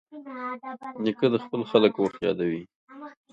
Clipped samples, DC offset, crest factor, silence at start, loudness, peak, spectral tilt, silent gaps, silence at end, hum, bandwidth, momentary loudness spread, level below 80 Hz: under 0.1%; under 0.1%; 22 dB; 0.1 s; -26 LUFS; -6 dBFS; -7.5 dB/octave; 2.75-2.88 s; 0.2 s; none; 7.6 kHz; 20 LU; -68 dBFS